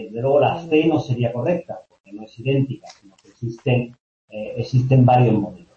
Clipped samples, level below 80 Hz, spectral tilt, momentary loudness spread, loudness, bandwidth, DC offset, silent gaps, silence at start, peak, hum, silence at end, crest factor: under 0.1%; -54 dBFS; -8.5 dB/octave; 21 LU; -19 LUFS; 6.8 kHz; under 0.1%; 2.00-2.04 s, 4.00-4.28 s; 0 s; -4 dBFS; none; 0.2 s; 16 dB